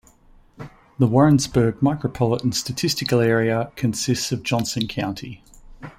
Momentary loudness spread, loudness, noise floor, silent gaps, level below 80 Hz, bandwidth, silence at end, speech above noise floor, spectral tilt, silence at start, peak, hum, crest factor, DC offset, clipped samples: 18 LU; -21 LUFS; -52 dBFS; none; -48 dBFS; 16.5 kHz; 0.1 s; 32 dB; -5.5 dB/octave; 0.6 s; -4 dBFS; none; 18 dB; under 0.1%; under 0.1%